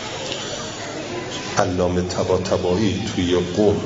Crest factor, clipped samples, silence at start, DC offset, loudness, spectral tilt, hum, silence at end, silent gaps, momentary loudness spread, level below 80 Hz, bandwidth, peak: 22 dB; under 0.1%; 0 s; under 0.1%; -22 LUFS; -5 dB/octave; none; 0 s; none; 9 LU; -50 dBFS; 8.6 kHz; 0 dBFS